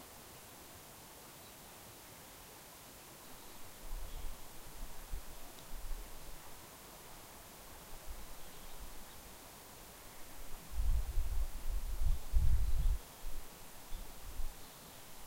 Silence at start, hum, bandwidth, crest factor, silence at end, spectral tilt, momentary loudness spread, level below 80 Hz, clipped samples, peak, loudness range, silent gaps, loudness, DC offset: 0 s; none; 16 kHz; 20 dB; 0 s; -4 dB/octave; 13 LU; -40 dBFS; under 0.1%; -18 dBFS; 11 LU; none; -47 LUFS; under 0.1%